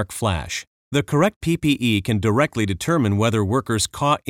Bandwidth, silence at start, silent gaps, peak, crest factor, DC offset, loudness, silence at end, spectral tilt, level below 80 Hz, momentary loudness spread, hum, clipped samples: 16.5 kHz; 0 s; 0.67-0.91 s, 1.36-1.41 s; -4 dBFS; 16 dB; under 0.1%; -21 LUFS; 0.1 s; -5 dB/octave; -44 dBFS; 6 LU; none; under 0.1%